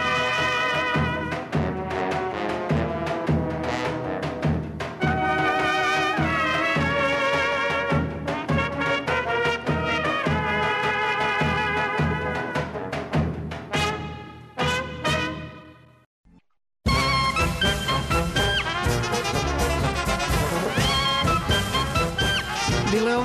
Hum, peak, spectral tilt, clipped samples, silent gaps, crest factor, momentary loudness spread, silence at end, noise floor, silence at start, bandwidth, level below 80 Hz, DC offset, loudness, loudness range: none; -12 dBFS; -4.5 dB/octave; under 0.1%; 16.06-16.24 s; 12 dB; 6 LU; 0 s; -48 dBFS; 0 s; 13.5 kHz; -38 dBFS; under 0.1%; -23 LUFS; 4 LU